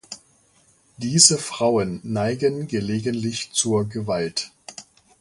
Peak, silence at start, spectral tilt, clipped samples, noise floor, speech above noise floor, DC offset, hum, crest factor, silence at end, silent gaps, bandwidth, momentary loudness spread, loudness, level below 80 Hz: 0 dBFS; 0.1 s; -3.5 dB/octave; under 0.1%; -59 dBFS; 37 dB; under 0.1%; none; 24 dB; 0.4 s; none; 11.5 kHz; 24 LU; -21 LUFS; -56 dBFS